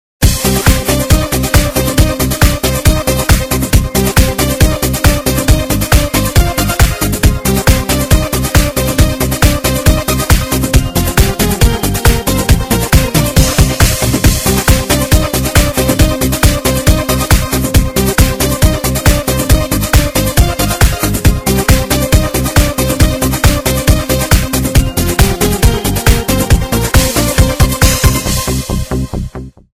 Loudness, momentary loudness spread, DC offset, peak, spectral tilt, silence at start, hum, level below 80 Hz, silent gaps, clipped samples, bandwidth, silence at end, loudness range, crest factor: -11 LUFS; 2 LU; 0.3%; 0 dBFS; -4.5 dB/octave; 0.2 s; none; -16 dBFS; none; 1%; 19 kHz; 0.25 s; 1 LU; 10 dB